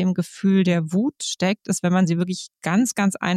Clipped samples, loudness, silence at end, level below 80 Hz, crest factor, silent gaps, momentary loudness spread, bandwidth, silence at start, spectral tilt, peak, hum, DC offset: under 0.1%; -21 LUFS; 0 s; -66 dBFS; 12 dB; none; 5 LU; 13.5 kHz; 0 s; -5.5 dB/octave; -8 dBFS; none; under 0.1%